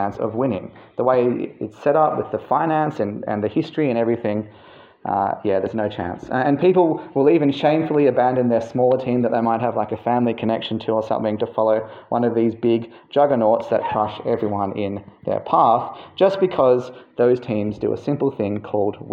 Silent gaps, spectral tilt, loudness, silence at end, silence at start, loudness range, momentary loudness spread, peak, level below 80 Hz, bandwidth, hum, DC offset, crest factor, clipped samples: none; -8.5 dB/octave; -20 LUFS; 0 s; 0 s; 4 LU; 9 LU; -4 dBFS; -60 dBFS; 7.2 kHz; none; under 0.1%; 16 dB; under 0.1%